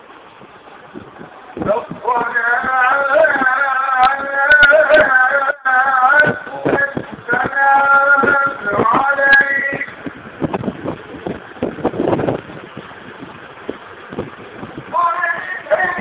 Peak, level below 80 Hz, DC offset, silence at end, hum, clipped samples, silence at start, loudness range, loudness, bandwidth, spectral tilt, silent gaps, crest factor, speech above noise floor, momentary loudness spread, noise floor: 0 dBFS; -48 dBFS; under 0.1%; 0 s; none; under 0.1%; 0.1 s; 12 LU; -14 LUFS; 4 kHz; -8 dB/octave; none; 16 dB; 23 dB; 21 LU; -40 dBFS